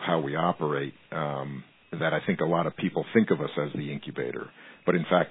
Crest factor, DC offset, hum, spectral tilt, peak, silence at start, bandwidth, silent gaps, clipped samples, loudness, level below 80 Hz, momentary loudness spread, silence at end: 20 dB; under 0.1%; none; -10.5 dB/octave; -8 dBFS; 0 s; 4 kHz; none; under 0.1%; -28 LUFS; -70 dBFS; 11 LU; 0 s